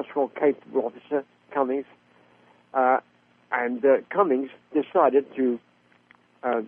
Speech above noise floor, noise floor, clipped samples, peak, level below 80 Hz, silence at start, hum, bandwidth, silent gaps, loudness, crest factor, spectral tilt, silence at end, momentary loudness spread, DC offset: 35 dB; -59 dBFS; under 0.1%; -6 dBFS; -74 dBFS; 0 s; 60 Hz at -60 dBFS; 3.6 kHz; none; -25 LUFS; 20 dB; -8.5 dB/octave; 0 s; 9 LU; under 0.1%